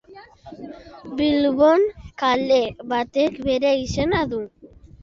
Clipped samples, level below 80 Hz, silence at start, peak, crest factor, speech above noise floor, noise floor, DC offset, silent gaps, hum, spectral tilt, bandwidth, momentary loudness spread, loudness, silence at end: under 0.1%; -46 dBFS; 0.1 s; -4 dBFS; 16 dB; 24 dB; -44 dBFS; under 0.1%; none; none; -5.5 dB/octave; 7.6 kHz; 22 LU; -20 LUFS; 0.35 s